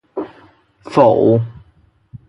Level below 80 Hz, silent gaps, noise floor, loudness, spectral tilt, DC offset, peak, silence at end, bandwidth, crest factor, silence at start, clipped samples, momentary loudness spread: -52 dBFS; none; -54 dBFS; -14 LUFS; -9 dB/octave; under 0.1%; 0 dBFS; 0.1 s; 11 kHz; 18 dB; 0.15 s; under 0.1%; 18 LU